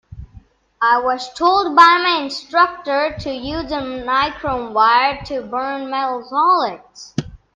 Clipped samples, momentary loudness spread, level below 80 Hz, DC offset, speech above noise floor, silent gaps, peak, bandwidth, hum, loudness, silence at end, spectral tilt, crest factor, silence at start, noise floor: under 0.1%; 14 LU; -46 dBFS; under 0.1%; 29 dB; none; 0 dBFS; 9.2 kHz; none; -17 LUFS; 0.2 s; -4.5 dB/octave; 18 dB; 0.1 s; -46 dBFS